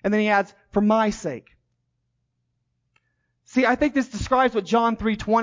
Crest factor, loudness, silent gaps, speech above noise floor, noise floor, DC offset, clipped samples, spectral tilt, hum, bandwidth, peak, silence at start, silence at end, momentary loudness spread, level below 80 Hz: 16 dB; -22 LUFS; none; 53 dB; -74 dBFS; under 0.1%; under 0.1%; -5.5 dB/octave; 60 Hz at -60 dBFS; 7.6 kHz; -8 dBFS; 0.05 s; 0 s; 7 LU; -48 dBFS